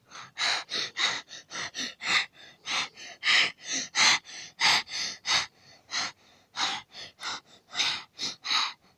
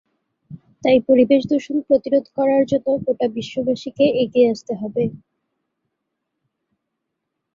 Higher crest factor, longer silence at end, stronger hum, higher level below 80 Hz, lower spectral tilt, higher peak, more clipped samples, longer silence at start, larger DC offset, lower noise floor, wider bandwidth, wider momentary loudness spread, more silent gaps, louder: first, 22 dB vs 16 dB; second, 0.25 s vs 2.4 s; neither; second, -74 dBFS vs -60 dBFS; second, 1 dB/octave vs -7 dB/octave; second, -10 dBFS vs -4 dBFS; neither; second, 0.1 s vs 0.5 s; neither; second, -49 dBFS vs -78 dBFS; first, 16 kHz vs 7.4 kHz; first, 15 LU vs 9 LU; neither; second, -27 LUFS vs -19 LUFS